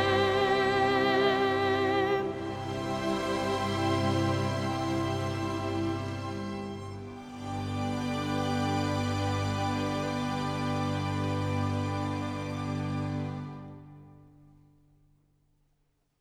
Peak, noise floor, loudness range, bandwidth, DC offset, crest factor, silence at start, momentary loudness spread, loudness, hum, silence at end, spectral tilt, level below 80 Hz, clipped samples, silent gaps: -14 dBFS; -73 dBFS; 8 LU; 14.5 kHz; under 0.1%; 16 dB; 0 s; 11 LU; -30 LUFS; 50 Hz at -55 dBFS; 2.05 s; -6 dB/octave; -56 dBFS; under 0.1%; none